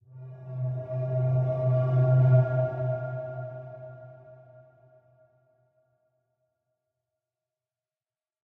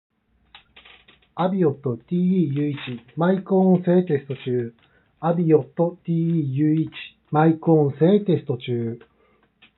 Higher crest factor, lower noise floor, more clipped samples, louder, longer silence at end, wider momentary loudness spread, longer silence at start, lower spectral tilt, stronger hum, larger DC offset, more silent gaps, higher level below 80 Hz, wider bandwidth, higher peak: about the same, 18 dB vs 18 dB; first, under -90 dBFS vs -61 dBFS; neither; second, -26 LUFS vs -21 LUFS; first, 4.1 s vs 0.8 s; first, 22 LU vs 12 LU; second, 0.15 s vs 1.35 s; first, -12 dB/octave vs -8 dB/octave; neither; neither; neither; about the same, -66 dBFS vs -68 dBFS; second, 2.6 kHz vs 4.1 kHz; second, -12 dBFS vs -4 dBFS